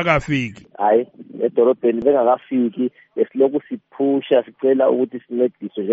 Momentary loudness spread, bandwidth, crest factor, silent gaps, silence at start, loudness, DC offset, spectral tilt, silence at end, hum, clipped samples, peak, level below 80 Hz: 9 LU; 8 kHz; 16 dB; none; 0 s; -19 LUFS; under 0.1%; -5.5 dB/octave; 0 s; none; under 0.1%; -2 dBFS; -50 dBFS